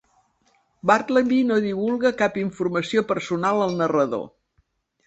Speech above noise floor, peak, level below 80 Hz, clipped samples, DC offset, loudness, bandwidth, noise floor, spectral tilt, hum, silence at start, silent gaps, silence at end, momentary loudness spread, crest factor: 46 dB; -2 dBFS; -62 dBFS; under 0.1%; under 0.1%; -22 LUFS; 8.2 kHz; -67 dBFS; -6 dB/octave; none; 0.85 s; none; 0.8 s; 7 LU; 20 dB